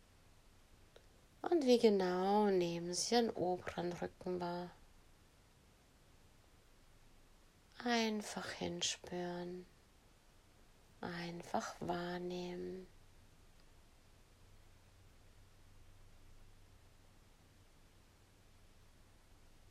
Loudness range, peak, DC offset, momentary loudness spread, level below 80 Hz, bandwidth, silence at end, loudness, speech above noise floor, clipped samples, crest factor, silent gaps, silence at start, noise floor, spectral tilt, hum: 15 LU; -18 dBFS; under 0.1%; 15 LU; -66 dBFS; 15 kHz; 2.85 s; -38 LUFS; 29 dB; under 0.1%; 24 dB; none; 1.05 s; -67 dBFS; -4.5 dB/octave; none